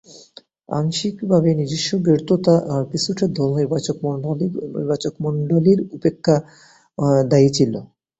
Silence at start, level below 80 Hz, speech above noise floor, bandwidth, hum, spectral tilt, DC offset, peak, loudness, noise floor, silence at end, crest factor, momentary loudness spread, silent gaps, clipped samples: 0.1 s; -54 dBFS; 29 dB; 8.2 kHz; none; -6.5 dB/octave; under 0.1%; -2 dBFS; -19 LUFS; -47 dBFS; 0.35 s; 18 dB; 8 LU; none; under 0.1%